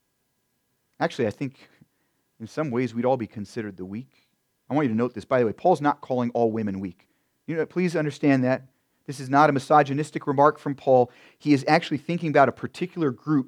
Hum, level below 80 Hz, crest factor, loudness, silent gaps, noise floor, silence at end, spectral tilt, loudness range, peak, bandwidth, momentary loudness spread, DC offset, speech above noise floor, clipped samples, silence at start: none; -72 dBFS; 22 dB; -24 LUFS; none; -73 dBFS; 0 s; -7 dB/octave; 8 LU; -4 dBFS; 12 kHz; 15 LU; under 0.1%; 50 dB; under 0.1%; 1 s